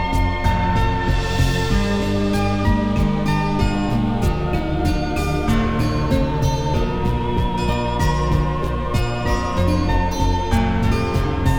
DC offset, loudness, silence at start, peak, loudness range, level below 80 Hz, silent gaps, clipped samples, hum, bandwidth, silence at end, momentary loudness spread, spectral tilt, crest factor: 0.3%; -20 LUFS; 0 s; -4 dBFS; 1 LU; -24 dBFS; none; under 0.1%; none; 18.5 kHz; 0 s; 3 LU; -6.5 dB/octave; 14 dB